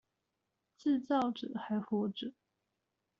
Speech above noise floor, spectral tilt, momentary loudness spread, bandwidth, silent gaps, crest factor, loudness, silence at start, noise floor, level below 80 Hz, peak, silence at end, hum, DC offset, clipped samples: 51 dB; -5 dB/octave; 10 LU; 7.2 kHz; none; 18 dB; -36 LUFS; 0.8 s; -86 dBFS; -80 dBFS; -20 dBFS; 0.9 s; none; under 0.1%; under 0.1%